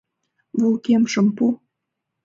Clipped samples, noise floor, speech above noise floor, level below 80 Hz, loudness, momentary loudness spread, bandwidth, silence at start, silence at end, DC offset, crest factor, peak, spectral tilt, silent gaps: under 0.1%; -80 dBFS; 62 dB; -68 dBFS; -20 LUFS; 9 LU; 7.6 kHz; 0.55 s; 0.7 s; under 0.1%; 14 dB; -8 dBFS; -6 dB/octave; none